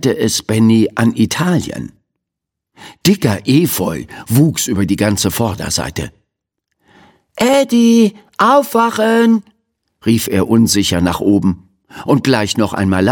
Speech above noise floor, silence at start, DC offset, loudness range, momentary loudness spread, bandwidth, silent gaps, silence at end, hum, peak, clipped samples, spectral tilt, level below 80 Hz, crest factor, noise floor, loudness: 67 dB; 0 s; under 0.1%; 4 LU; 9 LU; 17.5 kHz; none; 0 s; none; 0 dBFS; under 0.1%; -5 dB/octave; -44 dBFS; 14 dB; -80 dBFS; -14 LUFS